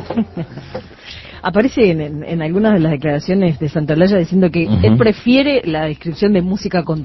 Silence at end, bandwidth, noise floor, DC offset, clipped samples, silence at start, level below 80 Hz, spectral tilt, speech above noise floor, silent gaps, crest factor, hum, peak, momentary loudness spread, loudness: 0 s; 6 kHz; -34 dBFS; under 0.1%; under 0.1%; 0 s; -36 dBFS; -8 dB/octave; 20 dB; none; 14 dB; none; 0 dBFS; 15 LU; -15 LUFS